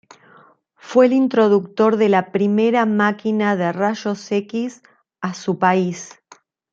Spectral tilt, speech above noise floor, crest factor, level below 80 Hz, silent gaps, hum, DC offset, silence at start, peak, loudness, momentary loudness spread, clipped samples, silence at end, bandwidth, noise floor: -6.5 dB/octave; 34 dB; 16 dB; -70 dBFS; none; none; under 0.1%; 0.85 s; -2 dBFS; -18 LUFS; 11 LU; under 0.1%; 0.65 s; 7.6 kHz; -51 dBFS